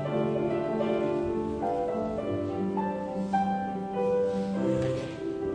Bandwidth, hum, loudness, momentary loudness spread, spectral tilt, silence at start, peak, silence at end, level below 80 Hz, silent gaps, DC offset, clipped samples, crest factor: 9.8 kHz; none; -30 LUFS; 4 LU; -8 dB/octave; 0 s; -16 dBFS; 0 s; -54 dBFS; none; under 0.1%; under 0.1%; 14 dB